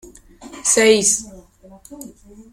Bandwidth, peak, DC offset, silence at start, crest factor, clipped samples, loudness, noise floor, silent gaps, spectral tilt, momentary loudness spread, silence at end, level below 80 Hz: 16 kHz; 0 dBFS; under 0.1%; 0.4 s; 20 dB; under 0.1%; -15 LUFS; -46 dBFS; none; -1.5 dB/octave; 25 LU; 0.1 s; -52 dBFS